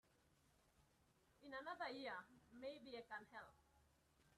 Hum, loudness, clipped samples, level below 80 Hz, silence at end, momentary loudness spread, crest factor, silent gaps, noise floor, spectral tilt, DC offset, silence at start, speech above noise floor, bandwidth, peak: none; -54 LUFS; under 0.1%; -84 dBFS; 0 s; 14 LU; 20 dB; none; -79 dBFS; -4 dB/octave; under 0.1%; 0.15 s; 25 dB; 13 kHz; -38 dBFS